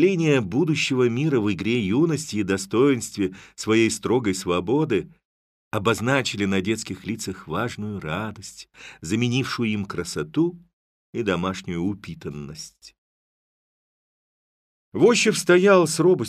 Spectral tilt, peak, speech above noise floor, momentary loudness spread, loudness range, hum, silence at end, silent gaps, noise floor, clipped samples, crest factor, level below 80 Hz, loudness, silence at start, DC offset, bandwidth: -5 dB/octave; -4 dBFS; over 68 dB; 17 LU; 9 LU; none; 0 s; 5.25-5.71 s, 10.73-11.13 s, 12.98-14.92 s; under -90 dBFS; under 0.1%; 18 dB; -56 dBFS; -22 LUFS; 0 s; under 0.1%; 15 kHz